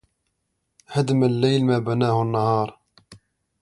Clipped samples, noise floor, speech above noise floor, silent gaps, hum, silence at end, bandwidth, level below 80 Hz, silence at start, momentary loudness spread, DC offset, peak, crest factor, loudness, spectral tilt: under 0.1%; -75 dBFS; 55 dB; none; none; 0.45 s; 11.5 kHz; -60 dBFS; 0.9 s; 6 LU; under 0.1%; -6 dBFS; 16 dB; -21 LUFS; -7.5 dB/octave